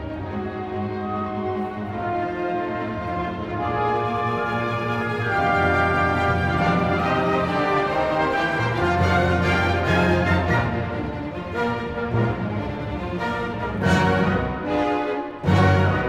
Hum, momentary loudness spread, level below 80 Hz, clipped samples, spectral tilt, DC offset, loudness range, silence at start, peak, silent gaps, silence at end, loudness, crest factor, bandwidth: none; 9 LU; -40 dBFS; under 0.1%; -7 dB/octave; under 0.1%; 5 LU; 0 s; -6 dBFS; none; 0 s; -22 LUFS; 16 dB; 12 kHz